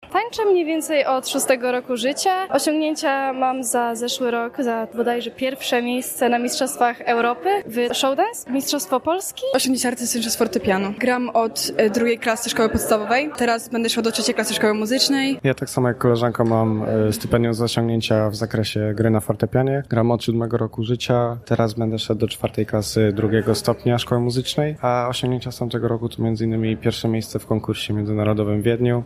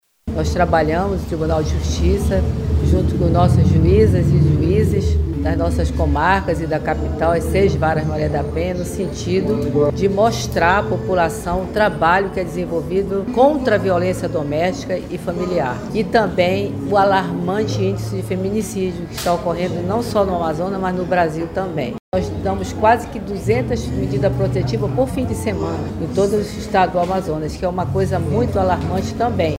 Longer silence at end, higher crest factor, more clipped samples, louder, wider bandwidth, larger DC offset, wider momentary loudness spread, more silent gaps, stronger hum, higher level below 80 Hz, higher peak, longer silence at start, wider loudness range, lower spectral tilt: about the same, 0 s vs 0 s; about the same, 18 dB vs 18 dB; neither; second, -21 LUFS vs -18 LUFS; about the same, 15 kHz vs 16 kHz; neither; second, 4 LU vs 8 LU; second, none vs 22.00-22.12 s; neither; second, -50 dBFS vs -28 dBFS; about the same, -2 dBFS vs 0 dBFS; second, 0 s vs 0.25 s; about the same, 2 LU vs 4 LU; second, -5 dB/octave vs -7 dB/octave